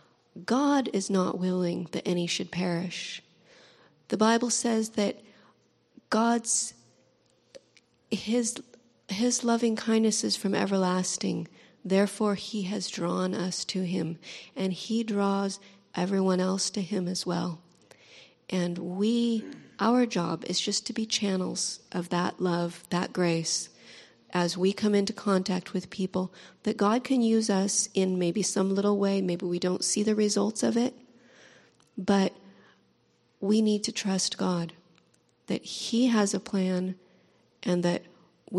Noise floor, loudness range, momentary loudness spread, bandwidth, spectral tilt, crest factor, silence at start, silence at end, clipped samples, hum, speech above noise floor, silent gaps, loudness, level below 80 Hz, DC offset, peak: -68 dBFS; 4 LU; 10 LU; 12.5 kHz; -4.5 dB/octave; 20 dB; 0.35 s; 0 s; under 0.1%; none; 40 dB; none; -28 LUFS; -72 dBFS; under 0.1%; -8 dBFS